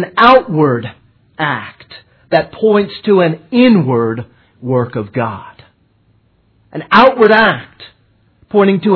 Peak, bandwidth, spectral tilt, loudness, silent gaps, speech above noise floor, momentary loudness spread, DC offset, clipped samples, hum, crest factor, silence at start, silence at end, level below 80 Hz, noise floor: 0 dBFS; 5.4 kHz; -8.5 dB/octave; -12 LUFS; none; 42 dB; 16 LU; under 0.1%; 0.3%; none; 14 dB; 0 s; 0 s; -48 dBFS; -54 dBFS